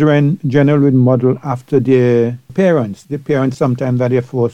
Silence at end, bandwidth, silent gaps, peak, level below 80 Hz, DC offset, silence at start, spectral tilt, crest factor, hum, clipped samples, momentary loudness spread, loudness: 0 s; 8.6 kHz; none; 0 dBFS; -52 dBFS; under 0.1%; 0 s; -9 dB/octave; 12 dB; none; under 0.1%; 7 LU; -14 LUFS